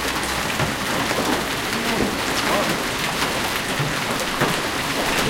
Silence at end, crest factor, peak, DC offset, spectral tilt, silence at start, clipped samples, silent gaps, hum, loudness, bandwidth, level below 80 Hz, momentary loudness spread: 0 s; 18 dB; -4 dBFS; under 0.1%; -3 dB/octave; 0 s; under 0.1%; none; none; -21 LUFS; 17 kHz; -40 dBFS; 2 LU